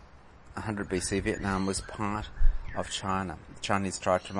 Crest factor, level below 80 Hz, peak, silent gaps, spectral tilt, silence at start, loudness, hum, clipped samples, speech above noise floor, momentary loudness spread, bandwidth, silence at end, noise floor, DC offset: 20 dB; -34 dBFS; -10 dBFS; none; -4.5 dB/octave; 0 s; -32 LUFS; none; under 0.1%; 24 dB; 8 LU; 11.5 kHz; 0 s; -52 dBFS; under 0.1%